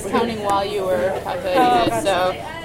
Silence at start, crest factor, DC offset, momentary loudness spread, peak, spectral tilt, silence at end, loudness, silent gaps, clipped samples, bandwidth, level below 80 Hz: 0 s; 16 dB; under 0.1%; 6 LU; -4 dBFS; -4.5 dB/octave; 0 s; -19 LUFS; none; under 0.1%; 16.5 kHz; -46 dBFS